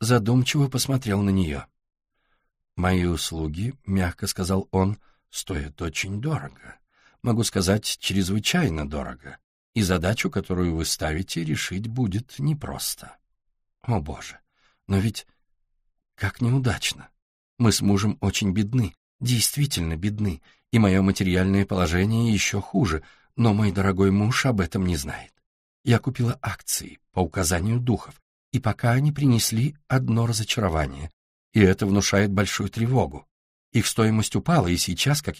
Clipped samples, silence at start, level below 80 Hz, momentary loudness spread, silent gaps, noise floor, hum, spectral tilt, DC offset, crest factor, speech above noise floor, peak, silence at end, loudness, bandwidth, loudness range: under 0.1%; 0 s; -42 dBFS; 10 LU; 9.44-9.73 s, 17.22-17.57 s, 18.97-19.19 s, 25.46-25.84 s, 28.22-28.52 s, 31.13-31.52 s, 33.31-33.72 s; -71 dBFS; none; -5 dB/octave; under 0.1%; 20 dB; 48 dB; -4 dBFS; 0 s; -24 LUFS; 15.5 kHz; 6 LU